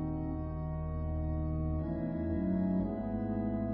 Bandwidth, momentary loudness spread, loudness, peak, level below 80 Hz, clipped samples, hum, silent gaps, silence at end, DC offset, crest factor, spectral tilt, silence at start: 4 kHz; 6 LU; -35 LUFS; -22 dBFS; -40 dBFS; under 0.1%; none; none; 0 s; under 0.1%; 12 dB; -11.5 dB/octave; 0 s